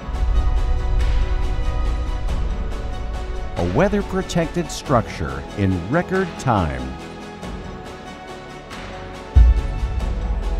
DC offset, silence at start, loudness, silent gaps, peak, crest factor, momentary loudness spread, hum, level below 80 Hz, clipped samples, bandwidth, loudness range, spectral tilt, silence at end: under 0.1%; 0 s; -23 LUFS; none; -2 dBFS; 18 dB; 15 LU; none; -22 dBFS; under 0.1%; 11 kHz; 4 LU; -6.5 dB/octave; 0 s